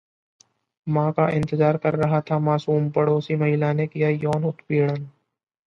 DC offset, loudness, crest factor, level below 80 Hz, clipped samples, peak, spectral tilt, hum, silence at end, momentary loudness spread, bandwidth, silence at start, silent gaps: under 0.1%; -22 LUFS; 16 dB; -60 dBFS; under 0.1%; -6 dBFS; -9 dB/octave; none; 0.55 s; 5 LU; 6.6 kHz; 0.85 s; none